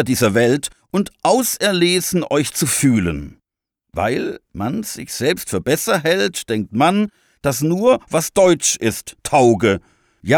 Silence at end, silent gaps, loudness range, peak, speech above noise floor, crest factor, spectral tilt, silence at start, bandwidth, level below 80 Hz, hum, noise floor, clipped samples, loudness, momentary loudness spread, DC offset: 0 s; none; 4 LU; -4 dBFS; 62 dB; 14 dB; -4 dB/octave; 0 s; over 20 kHz; -46 dBFS; none; -79 dBFS; under 0.1%; -17 LUFS; 11 LU; under 0.1%